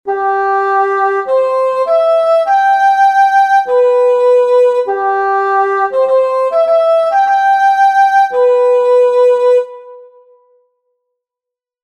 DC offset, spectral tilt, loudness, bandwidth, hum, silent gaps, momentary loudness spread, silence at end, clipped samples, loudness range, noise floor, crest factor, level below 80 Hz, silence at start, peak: under 0.1%; -2.5 dB/octave; -11 LUFS; 9 kHz; none; none; 4 LU; 1.8 s; under 0.1%; 2 LU; -85 dBFS; 10 dB; -58 dBFS; 0.05 s; -2 dBFS